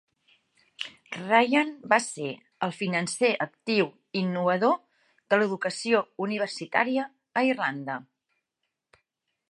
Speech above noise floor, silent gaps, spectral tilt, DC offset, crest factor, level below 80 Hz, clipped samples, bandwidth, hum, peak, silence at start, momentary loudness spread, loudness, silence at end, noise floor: 57 dB; none; -4.5 dB/octave; under 0.1%; 24 dB; -80 dBFS; under 0.1%; 11.5 kHz; none; -4 dBFS; 0.8 s; 12 LU; -27 LUFS; 1.5 s; -83 dBFS